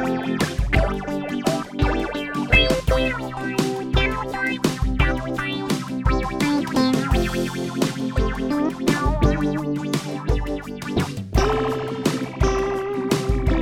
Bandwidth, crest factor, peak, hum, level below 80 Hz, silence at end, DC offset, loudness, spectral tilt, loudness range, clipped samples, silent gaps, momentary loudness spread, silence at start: 16.5 kHz; 18 dB; -4 dBFS; none; -28 dBFS; 0 s; under 0.1%; -22 LUFS; -5.5 dB/octave; 2 LU; under 0.1%; none; 5 LU; 0 s